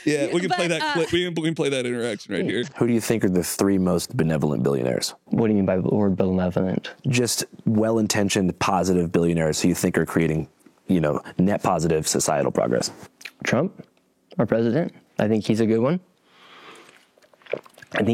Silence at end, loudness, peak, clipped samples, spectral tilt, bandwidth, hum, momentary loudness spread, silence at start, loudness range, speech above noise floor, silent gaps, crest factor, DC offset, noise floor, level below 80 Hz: 0 s; -22 LUFS; -4 dBFS; under 0.1%; -5 dB/octave; 17 kHz; none; 7 LU; 0 s; 3 LU; 34 dB; none; 18 dB; under 0.1%; -56 dBFS; -56 dBFS